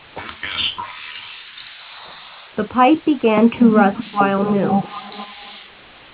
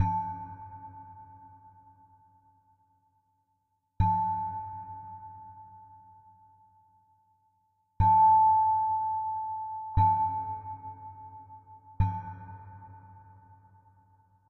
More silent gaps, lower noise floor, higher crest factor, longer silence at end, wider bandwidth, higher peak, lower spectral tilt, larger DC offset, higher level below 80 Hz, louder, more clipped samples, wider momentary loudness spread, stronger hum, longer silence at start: neither; second, -43 dBFS vs -77 dBFS; about the same, 20 dB vs 18 dB; second, 0.5 s vs 1.3 s; about the same, 4 kHz vs 4.1 kHz; first, 0 dBFS vs -14 dBFS; first, -10 dB/octave vs -8 dB/octave; neither; second, -54 dBFS vs -48 dBFS; first, -17 LUFS vs -27 LUFS; neither; second, 21 LU vs 27 LU; neither; first, 0.15 s vs 0 s